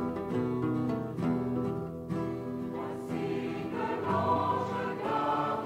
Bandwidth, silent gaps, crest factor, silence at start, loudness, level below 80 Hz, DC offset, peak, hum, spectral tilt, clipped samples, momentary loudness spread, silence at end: 15.5 kHz; none; 16 dB; 0 s; -32 LUFS; -60 dBFS; under 0.1%; -16 dBFS; none; -8 dB/octave; under 0.1%; 8 LU; 0 s